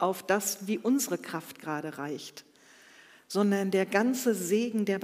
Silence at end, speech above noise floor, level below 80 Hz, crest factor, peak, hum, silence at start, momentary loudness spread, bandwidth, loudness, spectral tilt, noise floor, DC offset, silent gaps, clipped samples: 0 s; 27 dB; -84 dBFS; 20 dB; -10 dBFS; none; 0 s; 12 LU; 16 kHz; -29 LUFS; -4.5 dB/octave; -56 dBFS; under 0.1%; none; under 0.1%